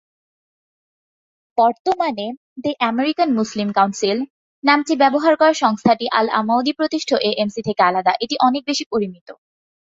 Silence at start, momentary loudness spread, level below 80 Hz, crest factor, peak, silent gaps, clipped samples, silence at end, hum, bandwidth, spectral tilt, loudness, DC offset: 1.55 s; 9 LU; -62 dBFS; 18 dB; -2 dBFS; 1.80-1.85 s, 2.37-2.56 s, 4.30-4.62 s, 8.86-8.91 s, 9.21-9.26 s; under 0.1%; 0.45 s; none; 7.8 kHz; -4.5 dB/octave; -18 LUFS; under 0.1%